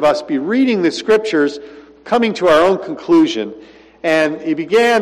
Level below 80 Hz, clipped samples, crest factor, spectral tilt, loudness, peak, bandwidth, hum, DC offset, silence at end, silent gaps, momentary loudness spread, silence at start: -54 dBFS; under 0.1%; 10 dB; -5 dB/octave; -15 LUFS; -4 dBFS; 13 kHz; none; under 0.1%; 0 s; none; 8 LU; 0 s